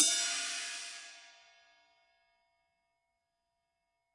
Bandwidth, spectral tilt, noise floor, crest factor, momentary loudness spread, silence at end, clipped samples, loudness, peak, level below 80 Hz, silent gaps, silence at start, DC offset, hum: 11.5 kHz; 3.5 dB/octave; -84 dBFS; 30 dB; 21 LU; 2.85 s; under 0.1%; -33 LUFS; -10 dBFS; under -90 dBFS; none; 0 s; under 0.1%; none